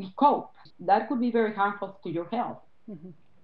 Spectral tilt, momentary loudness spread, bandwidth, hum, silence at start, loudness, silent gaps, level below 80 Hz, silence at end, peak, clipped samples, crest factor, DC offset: -9.5 dB/octave; 22 LU; 5.2 kHz; none; 0 s; -27 LUFS; none; -78 dBFS; 0.3 s; -8 dBFS; under 0.1%; 20 dB; 0.2%